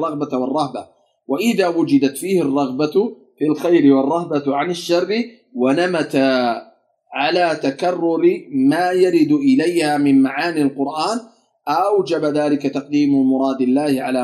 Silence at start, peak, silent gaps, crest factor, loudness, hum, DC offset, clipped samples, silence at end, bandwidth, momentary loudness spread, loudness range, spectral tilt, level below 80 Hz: 0 s; -2 dBFS; none; 16 dB; -17 LUFS; none; under 0.1%; under 0.1%; 0 s; 14.5 kHz; 7 LU; 3 LU; -5.5 dB/octave; -72 dBFS